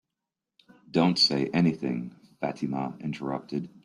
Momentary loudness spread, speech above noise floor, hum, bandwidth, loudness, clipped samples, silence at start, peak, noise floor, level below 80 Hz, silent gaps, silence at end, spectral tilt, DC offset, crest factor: 13 LU; 60 dB; none; 11.5 kHz; -27 LUFS; under 0.1%; 0.95 s; -10 dBFS; -87 dBFS; -66 dBFS; none; 0.05 s; -5.5 dB/octave; under 0.1%; 18 dB